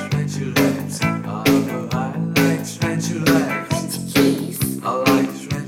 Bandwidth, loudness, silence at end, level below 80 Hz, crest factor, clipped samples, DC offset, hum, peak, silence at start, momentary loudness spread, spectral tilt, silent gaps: 17 kHz; -20 LUFS; 0 s; -48 dBFS; 16 dB; under 0.1%; under 0.1%; none; -4 dBFS; 0 s; 6 LU; -5 dB/octave; none